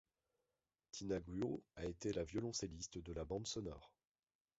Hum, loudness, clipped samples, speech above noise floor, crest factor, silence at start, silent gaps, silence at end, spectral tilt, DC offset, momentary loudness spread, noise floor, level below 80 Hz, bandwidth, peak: none; -46 LUFS; under 0.1%; over 44 dB; 18 dB; 0.95 s; none; 0.7 s; -5.5 dB/octave; under 0.1%; 8 LU; under -90 dBFS; -62 dBFS; 8 kHz; -30 dBFS